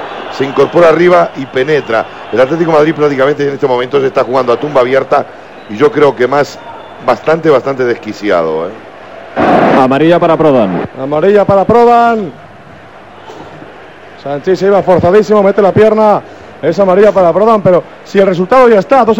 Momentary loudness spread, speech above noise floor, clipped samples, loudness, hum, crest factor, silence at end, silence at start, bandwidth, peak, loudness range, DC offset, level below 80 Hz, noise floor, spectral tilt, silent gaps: 12 LU; 25 dB; 1%; -9 LUFS; none; 10 dB; 0 s; 0 s; 9 kHz; 0 dBFS; 4 LU; 0.7%; -46 dBFS; -33 dBFS; -7 dB/octave; none